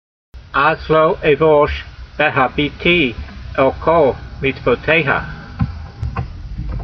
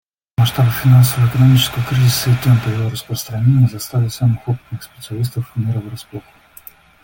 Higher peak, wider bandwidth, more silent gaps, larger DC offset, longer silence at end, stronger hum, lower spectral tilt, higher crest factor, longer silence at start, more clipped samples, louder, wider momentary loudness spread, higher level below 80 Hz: about the same, 0 dBFS vs -2 dBFS; second, 6.2 kHz vs 17 kHz; neither; neither; second, 0 s vs 0.85 s; neither; first, -8 dB/octave vs -5.5 dB/octave; about the same, 16 dB vs 14 dB; about the same, 0.35 s vs 0.4 s; neither; about the same, -16 LUFS vs -16 LUFS; second, 14 LU vs 17 LU; first, -32 dBFS vs -44 dBFS